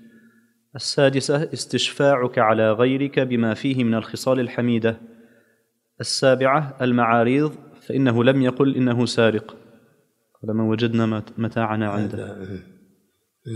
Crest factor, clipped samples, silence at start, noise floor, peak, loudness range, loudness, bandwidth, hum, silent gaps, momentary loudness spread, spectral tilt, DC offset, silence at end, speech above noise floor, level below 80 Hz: 18 dB; under 0.1%; 0.75 s; -67 dBFS; -2 dBFS; 6 LU; -21 LUFS; 13 kHz; none; none; 11 LU; -5.5 dB/octave; under 0.1%; 0 s; 47 dB; -66 dBFS